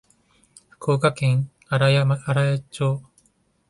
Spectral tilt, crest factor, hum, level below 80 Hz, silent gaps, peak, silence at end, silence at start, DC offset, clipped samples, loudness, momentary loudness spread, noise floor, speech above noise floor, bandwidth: -6.5 dB/octave; 16 dB; none; -58 dBFS; none; -6 dBFS; 0.7 s; 0.8 s; under 0.1%; under 0.1%; -22 LUFS; 7 LU; -64 dBFS; 44 dB; 11.5 kHz